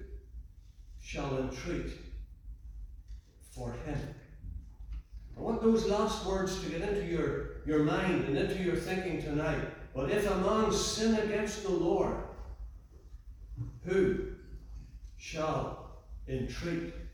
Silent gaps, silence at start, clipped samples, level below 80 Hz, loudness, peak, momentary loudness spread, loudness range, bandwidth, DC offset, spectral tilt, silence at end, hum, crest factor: none; 0 s; under 0.1%; -46 dBFS; -33 LUFS; -16 dBFS; 21 LU; 10 LU; 19.5 kHz; under 0.1%; -5.5 dB/octave; 0 s; none; 18 dB